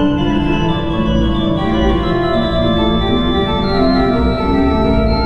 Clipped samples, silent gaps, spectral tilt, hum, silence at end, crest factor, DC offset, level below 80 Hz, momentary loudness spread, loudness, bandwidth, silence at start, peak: under 0.1%; none; -8 dB/octave; none; 0 s; 12 dB; 2%; -22 dBFS; 2 LU; -15 LUFS; 7.6 kHz; 0 s; -2 dBFS